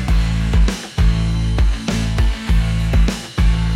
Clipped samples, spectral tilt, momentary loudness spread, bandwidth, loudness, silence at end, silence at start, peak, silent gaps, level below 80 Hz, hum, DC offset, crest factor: under 0.1%; -6 dB/octave; 3 LU; 12 kHz; -18 LUFS; 0 s; 0 s; -4 dBFS; none; -16 dBFS; none; under 0.1%; 12 dB